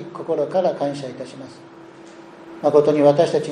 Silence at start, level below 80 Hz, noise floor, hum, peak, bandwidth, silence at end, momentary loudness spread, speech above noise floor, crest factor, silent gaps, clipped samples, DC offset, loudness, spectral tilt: 0 s; -70 dBFS; -42 dBFS; none; -2 dBFS; 10 kHz; 0 s; 22 LU; 23 dB; 18 dB; none; under 0.1%; under 0.1%; -19 LUFS; -6.5 dB/octave